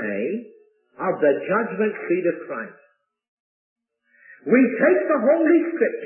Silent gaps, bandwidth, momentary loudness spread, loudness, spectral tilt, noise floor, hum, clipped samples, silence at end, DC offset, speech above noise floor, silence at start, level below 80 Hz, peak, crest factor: 3.28-3.76 s; 3 kHz; 15 LU; -20 LUFS; -11.5 dB/octave; -59 dBFS; none; under 0.1%; 0 s; under 0.1%; 39 dB; 0 s; -74 dBFS; -4 dBFS; 18 dB